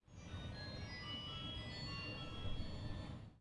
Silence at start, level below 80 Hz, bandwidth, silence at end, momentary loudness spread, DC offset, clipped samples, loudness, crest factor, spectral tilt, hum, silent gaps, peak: 0.05 s; -54 dBFS; 11 kHz; 0 s; 4 LU; under 0.1%; under 0.1%; -48 LUFS; 16 dB; -5.5 dB/octave; none; none; -32 dBFS